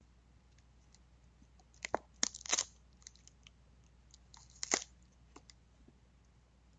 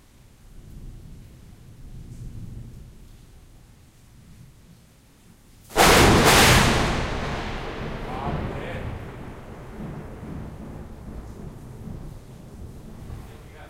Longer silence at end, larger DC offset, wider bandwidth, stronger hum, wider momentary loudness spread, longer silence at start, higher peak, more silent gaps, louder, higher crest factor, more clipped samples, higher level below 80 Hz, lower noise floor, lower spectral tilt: first, 1.95 s vs 0 s; neither; second, 9 kHz vs 16 kHz; neither; about the same, 27 LU vs 29 LU; first, 1.8 s vs 0.55 s; second, -10 dBFS vs -2 dBFS; neither; second, -38 LUFS vs -20 LUFS; first, 36 dB vs 22 dB; neither; second, -66 dBFS vs -36 dBFS; first, -66 dBFS vs -53 dBFS; second, -0.5 dB/octave vs -3.5 dB/octave